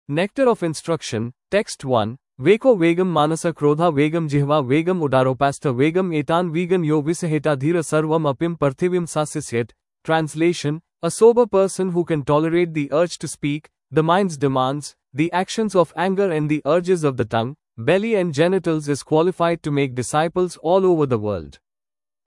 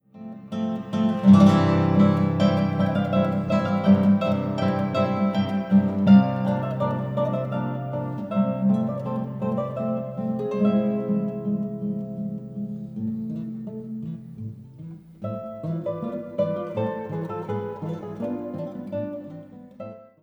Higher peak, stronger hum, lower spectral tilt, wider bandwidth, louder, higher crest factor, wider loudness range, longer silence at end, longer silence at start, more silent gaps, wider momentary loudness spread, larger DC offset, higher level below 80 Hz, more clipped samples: about the same, -2 dBFS vs -4 dBFS; neither; second, -6 dB/octave vs -9 dB/octave; first, 12 kHz vs 7.4 kHz; first, -20 LUFS vs -24 LUFS; about the same, 18 dB vs 20 dB; second, 3 LU vs 13 LU; first, 0.75 s vs 0.2 s; about the same, 0.1 s vs 0.15 s; neither; second, 8 LU vs 16 LU; neither; about the same, -56 dBFS vs -60 dBFS; neither